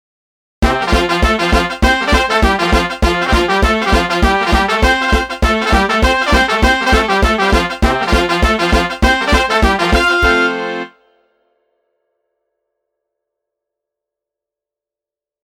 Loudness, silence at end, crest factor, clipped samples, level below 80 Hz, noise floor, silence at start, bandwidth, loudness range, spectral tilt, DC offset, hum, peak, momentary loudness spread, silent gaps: -13 LUFS; 4.55 s; 14 dB; under 0.1%; -20 dBFS; -88 dBFS; 0.6 s; 16 kHz; 4 LU; -4.5 dB/octave; under 0.1%; none; 0 dBFS; 4 LU; none